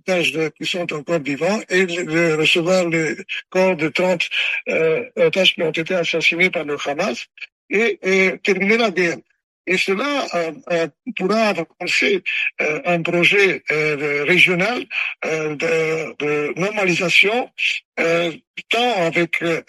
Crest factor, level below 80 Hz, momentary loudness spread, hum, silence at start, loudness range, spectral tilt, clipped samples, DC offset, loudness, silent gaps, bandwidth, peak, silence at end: 20 dB; -66 dBFS; 9 LU; none; 0.05 s; 3 LU; -4 dB/octave; under 0.1%; under 0.1%; -18 LUFS; 7.52-7.69 s, 9.43-9.65 s, 17.85-17.92 s, 18.47-18.54 s; 12.5 kHz; 0 dBFS; 0.05 s